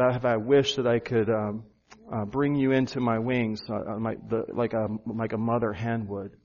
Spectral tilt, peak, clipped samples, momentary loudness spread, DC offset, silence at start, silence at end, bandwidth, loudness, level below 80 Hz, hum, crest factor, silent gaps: -5.5 dB/octave; -10 dBFS; under 0.1%; 10 LU; under 0.1%; 0 s; 0.15 s; 7.2 kHz; -27 LUFS; -58 dBFS; none; 16 dB; none